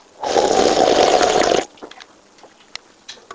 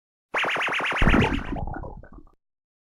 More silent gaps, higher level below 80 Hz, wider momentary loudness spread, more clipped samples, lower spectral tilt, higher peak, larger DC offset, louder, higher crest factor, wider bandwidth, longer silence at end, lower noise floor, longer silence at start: neither; second, -48 dBFS vs -32 dBFS; first, 22 LU vs 16 LU; neither; second, -2.5 dB/octave vs -5.5 dB/octave; first, 0 dBFS vs -8 dBFS; neither; first, -15 LUFS vs -24 LUFS; about the same, 18 dB vs 18 dB; second, 8 kHz vs 13 kHz; second, 0 s vs 0.65 s; about the same, -47 dBFS vs -44 dBFS; second, 0.2 s vs 0.35 s